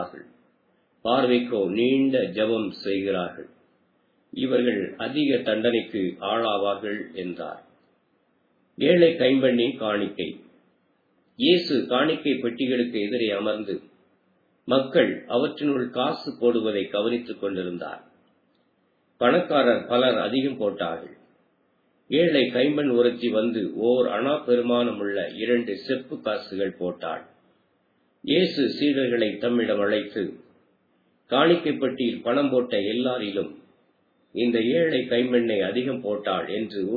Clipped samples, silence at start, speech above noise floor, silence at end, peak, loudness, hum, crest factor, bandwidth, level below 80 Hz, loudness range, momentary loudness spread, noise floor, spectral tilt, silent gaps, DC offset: under 0.1%; 0 s; 44 dB; 0 s; -6 dBFS; -24 LUFS; none; 20 dB; 4.9 kHz; -72 dBFS; 4 LU; 11 LU; -67 dBFS; -8 dB/octave; none; under 0.1%